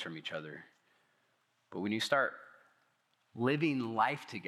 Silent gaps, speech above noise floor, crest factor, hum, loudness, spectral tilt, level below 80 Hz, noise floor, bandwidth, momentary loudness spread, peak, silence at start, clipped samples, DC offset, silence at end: none; 41 dB; 24 dB; none; -34 LUFS; -5 dB/octave; under -90 dBFS; -76 dBFS; 15 kHz; 19 LU; -14 dBFS; 0 s; under 0.1%; under 0.1%; 0 s